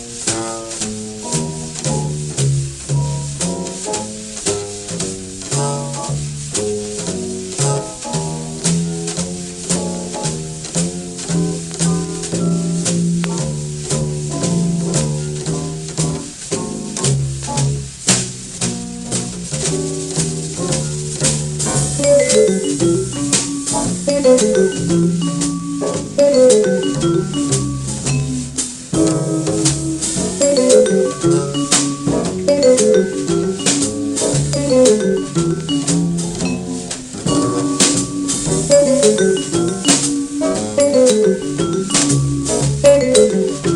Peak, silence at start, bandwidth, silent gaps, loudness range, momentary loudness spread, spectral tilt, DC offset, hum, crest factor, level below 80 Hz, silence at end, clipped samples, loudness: 0 dBFS; 0 s; 12.5 kHz; none; 6 LU; 10 LU; -4.5 dB/octave; under 0.1%; none; 16 dB; -40 dBFS; 0 s; under 0.1%; -17 LUFS